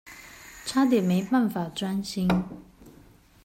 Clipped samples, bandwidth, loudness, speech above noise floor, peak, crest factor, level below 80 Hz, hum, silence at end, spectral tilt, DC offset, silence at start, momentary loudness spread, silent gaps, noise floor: under 0.1%; 16 kHz; -26 LUFS; 30 dB; -10 dBFS; 16 dB; -54 dBFS; none; 0.55 s; -6 dB/octave; under 0.1%; 0.05 s; 22 LU; none; -54 dBFS